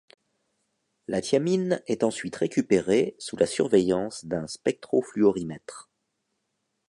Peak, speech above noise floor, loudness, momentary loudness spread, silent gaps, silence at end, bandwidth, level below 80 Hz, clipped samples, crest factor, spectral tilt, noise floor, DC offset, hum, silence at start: -8 dBFS; 53 dB; -26 LUFS; 11 LU; none; 1.1 s; 11.5 kHz; -62 dBFS; under 0.1%; 20 dB; -5.5 dB/octave; -78 dBFS; under 0.1%; none; 1.1 s